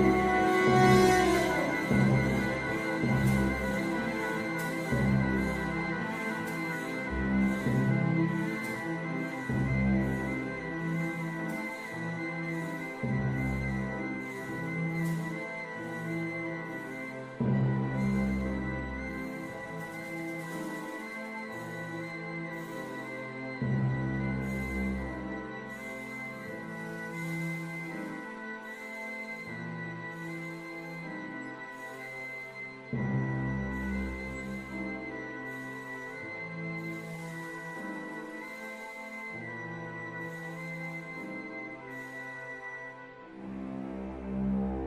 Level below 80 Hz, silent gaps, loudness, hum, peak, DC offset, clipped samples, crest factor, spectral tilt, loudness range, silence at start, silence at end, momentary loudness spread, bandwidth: -48 dBFS; none; -33 LUFS; none; -10 dBFS; under 0.1%; under 0.1%; 24 dB; -6.5 dB/octave; 10 LU; 0 s; 0 s; 12 LU; 15.5 kHz